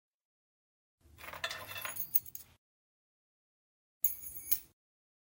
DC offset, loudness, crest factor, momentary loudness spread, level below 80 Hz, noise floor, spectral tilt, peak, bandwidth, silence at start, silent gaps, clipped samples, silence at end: under 0.1%; -34 LUFS; 28 dB; 17 LU; -72 dBFS; under -90 dBFS; 0 dB/octave; -12 dBFS; 17 kHz; 1.15 s; 2.58-4.01 s; under 0.1%; 0.65 s